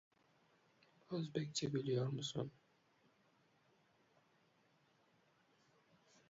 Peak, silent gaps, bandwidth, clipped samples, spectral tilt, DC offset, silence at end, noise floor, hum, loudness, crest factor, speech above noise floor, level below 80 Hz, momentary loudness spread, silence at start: -26 dBFS; none; 7.4 kHz; under 0.1%; -6 dB/octave; under 0.1%; 3.8 s; -76 dBFS; none; -43 LUFS; 22 dB; 34 dB; -82 dBFS; 8 LU; 1.1 s